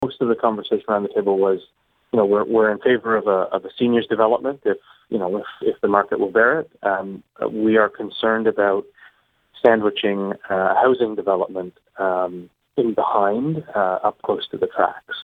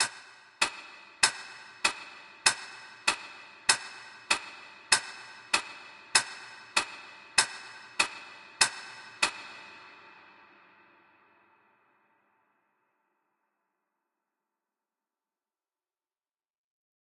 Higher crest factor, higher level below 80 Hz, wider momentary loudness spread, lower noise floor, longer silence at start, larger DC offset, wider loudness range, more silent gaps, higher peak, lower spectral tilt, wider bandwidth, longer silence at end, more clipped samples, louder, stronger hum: second, 20 dB vs 30 dB; first, -62 dBFS vs -78 dBFS; second, 9 LU vs 20 LU; second, -55 dBFS vs under -90 dBFS; about the same, 0 s vs 0 s; neither; about the same, 2 LU vs 4 LU; neither; first, 0 dBFS vs -4 dBFS; first, -8 dB/octave vs 1.5 dB/octave; second, 4.5 kHz vs 11 kHz; second, 0 s vs 7.25 s; neither; first, -20 LUFS vs -29 LUFS; neither